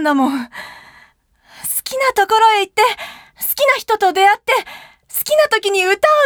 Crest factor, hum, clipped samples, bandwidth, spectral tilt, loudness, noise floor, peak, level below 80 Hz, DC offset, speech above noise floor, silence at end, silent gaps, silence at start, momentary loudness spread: 16 dB; none; under 0.1%; over 20 kHz; -1 dB/octave; -15 LUFS; -52 dBFS; 0 dBFS; -58 dBFS; under 0.1%; 38 dB; 0 s; none; 0 s; 15 LU